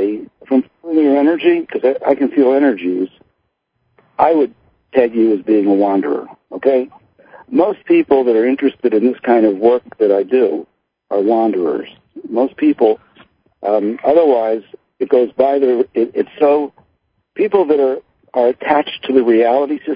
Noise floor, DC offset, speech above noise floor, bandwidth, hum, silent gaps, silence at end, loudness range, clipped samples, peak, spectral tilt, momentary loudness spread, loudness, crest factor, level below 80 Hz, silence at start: -68 dBFS; under 0.1%; 55 dB; 5.2 kHz; none; none; 0 s; 2 LU; under 0.1%; 0 dBFS; -10 dB/octave; 10 LU; -15 LUFS; 14 dB; -62 dBFS; 0 s